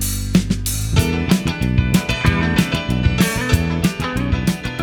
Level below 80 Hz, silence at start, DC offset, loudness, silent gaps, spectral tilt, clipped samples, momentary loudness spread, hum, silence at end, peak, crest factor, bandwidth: -26 dBFS; 0 s; under 0.1%; -18 LUFS; none; -5 dB/octave; under 0.1%; 4 LU; none; 0 s; 0 dBFS; 18 dB; 20 kHz